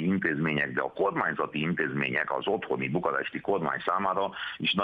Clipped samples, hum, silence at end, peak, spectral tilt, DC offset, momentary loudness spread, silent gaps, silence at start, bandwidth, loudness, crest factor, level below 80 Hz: under 0.1%; none; 0 s; -10 dBFS; -8 dB/octave; under 0.1%; 3 LU; none; 0 s; 5.4 kHz; -29 LUFS; 18 dB; -64 dBFS